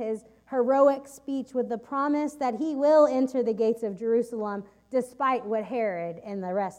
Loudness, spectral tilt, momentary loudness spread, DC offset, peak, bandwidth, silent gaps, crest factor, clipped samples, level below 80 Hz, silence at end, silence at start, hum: -26 LUFS; -6.5 dB/octave; 13 LU; under 0.1%; -8 dBFS; 14.5 kHz; none; 18 dB; under 0.1%; -70 dBFS; 0.05 s; 0 s; none